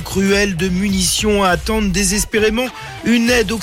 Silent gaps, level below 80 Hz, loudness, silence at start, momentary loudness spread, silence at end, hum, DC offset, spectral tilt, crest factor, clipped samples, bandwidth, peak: none; -30 dBFS; -15 LUFS; 0 s; 4 LU; 0 s; none; under 0.1%; -3.5 dB/octave; 12 dB; under 0.1%; 16.5 kHz; -4 dBFS